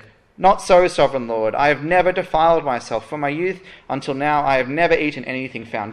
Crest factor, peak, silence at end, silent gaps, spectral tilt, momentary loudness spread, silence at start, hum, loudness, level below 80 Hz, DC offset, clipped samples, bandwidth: 16 dB; -2 dBFS; 0 s; none; -5 dB/octave; 12 LU; 0.4 s; none; -18 LUFS; -46 dBFS; under 0.1%; under 0.1%; 11.5 kHz